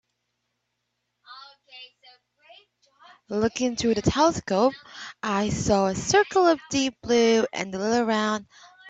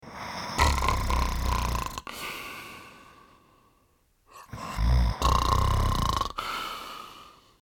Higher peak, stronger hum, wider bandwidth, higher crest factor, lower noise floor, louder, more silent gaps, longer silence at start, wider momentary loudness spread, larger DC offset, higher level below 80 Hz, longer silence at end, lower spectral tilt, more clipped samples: about the same, -6 dBFS vs -8 dBFS; first, 60 Hz at -55 dBFS vs none; second, 9 kHz vs 17.5 kHz; about the same, 20 dB vs 22 dB; first, -78 dBFS vs -66 dBFS; first, -23 LUFS vs -28 LUFS; neither; first, 1.3 s vs 0.05 s; about the same, 19 LU vs 18 LU; neither; second, -52 dBFS vs -32 dBFS; second, 0 s vs 0.35 s; about the same, -4.5 dB/octave vs -4.5 dB/octave; neither